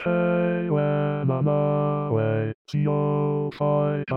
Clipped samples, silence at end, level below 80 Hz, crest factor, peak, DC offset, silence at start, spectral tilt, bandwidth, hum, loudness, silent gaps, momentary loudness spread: under 0.1%; 0 s; -64 dBFS; 12 dB; -12 dBFS; 0.1%; 0 s; -10 dB/octave; 6 kHz; none; -24 LUFS; 2.54-2.65 s; 3 LU